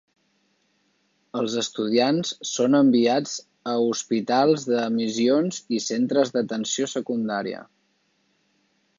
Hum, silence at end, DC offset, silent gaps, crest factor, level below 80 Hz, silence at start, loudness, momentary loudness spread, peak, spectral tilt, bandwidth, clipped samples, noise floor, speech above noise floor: none; 1.35 s; under 0.1%; none; 16 dB; -74 dBFS; 1.35 s; -23 LUFS; 10 LU; -8 dBFS; -4.5 dB/octave; 7.6 kHz; under 0.1%; -68 dBFS; 46 dB